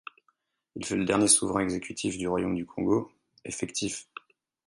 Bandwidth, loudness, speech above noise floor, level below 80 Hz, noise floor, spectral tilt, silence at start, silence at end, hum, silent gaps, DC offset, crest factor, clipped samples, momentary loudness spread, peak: 11.5 kHz; -27 LUFS; 45 dB; -58 dBFS; -73 dBFS; -3.5 dB/octave; 0.75 s; 0.65 s; none; none; under 0.1%; 22 dB; under 0.1%; 24 LU; -6 dBFS